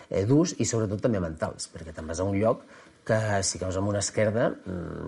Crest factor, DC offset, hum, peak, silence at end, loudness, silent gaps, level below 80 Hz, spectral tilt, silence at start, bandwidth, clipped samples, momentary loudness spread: 18 dB; under 0.1%; none; -10 dBFS; 0 s; -27 LUFS; none; -52 dBFS; -5 dB/octave; 0 s; 11.5 kHz; under 0.1%; 12 LU